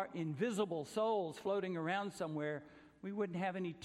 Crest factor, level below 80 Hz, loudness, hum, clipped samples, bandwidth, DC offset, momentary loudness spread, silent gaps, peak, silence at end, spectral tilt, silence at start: 16 dB; -80 dBFS; -40 LUFS; none; under 0.1%; 13.5 kHz; under 0.1%; 6 LU; none; -24 dBFS; 0 s; -6 dB/octave; 0 s